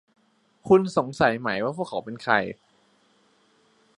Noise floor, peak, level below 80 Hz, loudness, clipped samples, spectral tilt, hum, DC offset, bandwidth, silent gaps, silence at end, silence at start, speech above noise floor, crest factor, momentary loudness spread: -63 dBFS; -4 dBFS; -60 dBFS; -24 LUFS; under 0.1%; -6 dB/octave; none; under 0.1%; 11 kHz; none; 1.45 s; 0.65 s; 40 dB; 22 dB; 15 LU